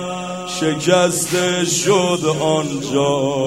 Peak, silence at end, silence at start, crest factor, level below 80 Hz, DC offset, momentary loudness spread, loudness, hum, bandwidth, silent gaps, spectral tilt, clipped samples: -2 dBFS; 0 s; 0 s; 16 dB; -58 dBFS; 0.2%; 6 LU; -17 LUFS; none; 16 kHz; none; -4 dB/octave; under 0.1%